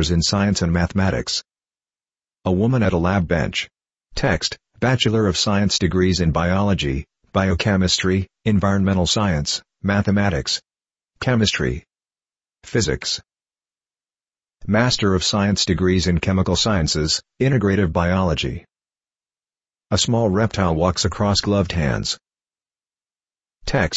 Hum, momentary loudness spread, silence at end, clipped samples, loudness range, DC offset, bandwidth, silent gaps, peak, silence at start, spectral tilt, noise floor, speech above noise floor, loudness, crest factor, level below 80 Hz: none; 7 LU; 0 s; under 0.1%; 4 LU; under 0.1%; 8.2 kHz; none; -2 dBFS; 0 s; -5 dB/octave; under -90 dBFS; over 71 dB; -19 LUFS; 18 dB; -36 dBFS